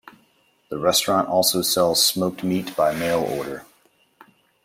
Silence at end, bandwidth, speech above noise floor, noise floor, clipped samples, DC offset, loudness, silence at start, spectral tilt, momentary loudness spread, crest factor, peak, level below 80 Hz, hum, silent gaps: 1 s; 16.5 kHz; 41 dB; -62 dBFS; under 0.1%; under 0.1%; -20 LUFS; 0.7 s; -3 dB/octave; 12 LU; 18 dB; -4 dBFS; -60 dBFS; none; none